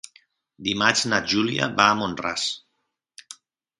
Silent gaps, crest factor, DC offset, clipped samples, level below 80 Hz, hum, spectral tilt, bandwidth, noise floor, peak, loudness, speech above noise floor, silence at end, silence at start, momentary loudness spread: none; 24 dB; under 0.1%; under 0.1%; -58 dBFS; none; -3 dB/octave; 11.5 kHz; -76 dBFS; 0 dBFS; -22 LUFS; 54 dB; 0.45 s; 0.6 s; 15 LU